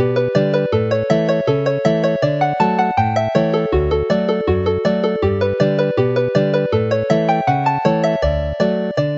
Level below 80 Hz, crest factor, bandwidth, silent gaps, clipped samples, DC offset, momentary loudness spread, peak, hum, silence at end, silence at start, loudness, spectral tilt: -34 dBFS; 16 dB; 7.8 kHz; none; under 0.1%; under 0.1%; 2 LU; 0 dBFS; none; 0 s; 0 s; -17 LUFS; -7.5 dB/octave